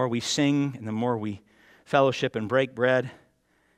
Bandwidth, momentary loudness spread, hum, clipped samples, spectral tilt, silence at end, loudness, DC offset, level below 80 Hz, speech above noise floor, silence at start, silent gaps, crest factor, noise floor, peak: 13.5 kHz; 9 LU; none; under 0.1%; -5 dB/octave; 0.65 s; -26 LUFS; under 0.1%; -68 dBFS; 42 dB; 0 s; none; 20 dB; -67 dBFS; -6 dBFS